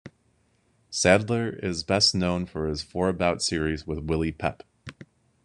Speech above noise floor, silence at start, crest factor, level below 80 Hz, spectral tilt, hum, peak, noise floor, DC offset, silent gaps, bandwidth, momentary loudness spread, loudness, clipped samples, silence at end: 41 dB; 0.05 s; 24 dB; -46 dBFS; -4 dB/octave; none; -2 dBFS; -67 dBFS; under 0.1%; none; 11 kHz; 13 LU; -25 LUFS; under 0.1%; 0.4 s